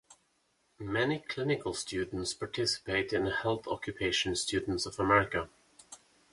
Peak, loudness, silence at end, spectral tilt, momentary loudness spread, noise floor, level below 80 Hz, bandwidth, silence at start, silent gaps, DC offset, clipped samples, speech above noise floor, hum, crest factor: -10 dBFS; -32 LUFS; 0.35 s; -4 dB/octave; 16 LU; -74 dBFS; -56 dBFS; 11.5 kHz; 0.1 s; none; under 0.1%; under 0.1%; 41 dB; none; 22 dB